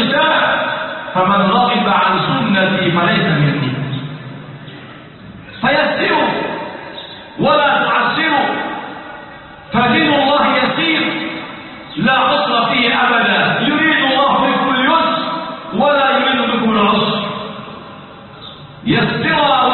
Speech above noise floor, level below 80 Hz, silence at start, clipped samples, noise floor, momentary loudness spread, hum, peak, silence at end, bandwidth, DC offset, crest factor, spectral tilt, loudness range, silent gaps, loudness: 22 dB; -50 dBFS; 0 s; under 0.1%; -35 dBFS; 19 LU; none; 0 dBFS; 0 s; 4.4 kHz; under 0.1%; 14 dB; -10.5 dB/octave; 5 LU; none; -14 LUFS